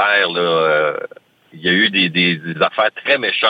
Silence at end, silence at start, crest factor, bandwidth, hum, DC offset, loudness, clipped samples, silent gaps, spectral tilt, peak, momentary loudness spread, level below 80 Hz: 0 s; 0 s; 16 dB; 5.2 kHz; none; under 0.1%; -15 LUFS; under 0.1%; none; -6.5 dB/octave; -2 dBFS; 8 LU; -62 dBFS